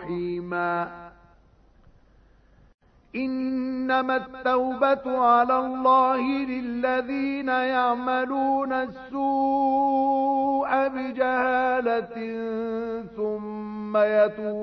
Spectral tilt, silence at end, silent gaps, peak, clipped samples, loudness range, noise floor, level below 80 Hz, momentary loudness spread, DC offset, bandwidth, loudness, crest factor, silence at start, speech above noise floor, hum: -8 dB/octave; 0 s; 2.74-2.78 s; -8 dBFS; under 0.1%; 8 LU; -57 dBFS; -60 dBFS; 10 LU; under 0.1%; 5.8 kHz; -24 LUFS; 16 dB; 0 s; 33 dB; none